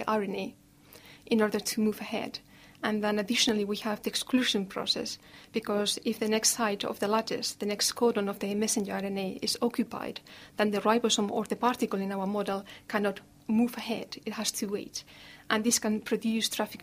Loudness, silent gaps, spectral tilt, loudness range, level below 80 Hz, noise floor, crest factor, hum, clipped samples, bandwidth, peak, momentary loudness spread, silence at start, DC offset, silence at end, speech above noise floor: -30 LUFS; none; -3 dB/octave; 3 LU; -68 dBFS; -54 dBFS; 20 dB; none; under 0.1%; 15.5 kHz; -10 dBFS; 11 LU; 0 s; under 0.1%; 0 s; 24 dB